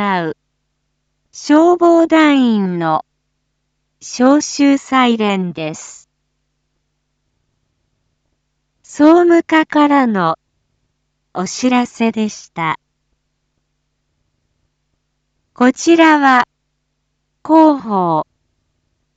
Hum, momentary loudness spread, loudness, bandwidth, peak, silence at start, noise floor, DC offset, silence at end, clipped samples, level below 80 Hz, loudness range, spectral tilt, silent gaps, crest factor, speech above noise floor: none; 17 LU; -13 LUFS; 8 kHz; 0 dBFS; 0 s; -69 dBFS; under 0.1%; 0.95 s; under 0.1%; -62 dBFS; 10 LU; -5 dB/octave; none; 16 dB; 57 dB